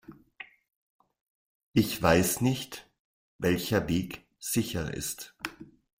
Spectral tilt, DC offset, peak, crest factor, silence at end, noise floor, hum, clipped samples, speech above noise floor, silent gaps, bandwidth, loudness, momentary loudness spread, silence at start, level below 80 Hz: -4.5 dB/octave; under 0.1%; -8 dBFS; 24 dB; 0.35 s; -51 dBFS; none; under 0.1%; 23 dB; 0.76-0.99 s, 1.21-1.72 s, 2.99-3.39 s; 16.5 kHz; -29 LUFS; 21 LU; 0.1 s; -54 dBFS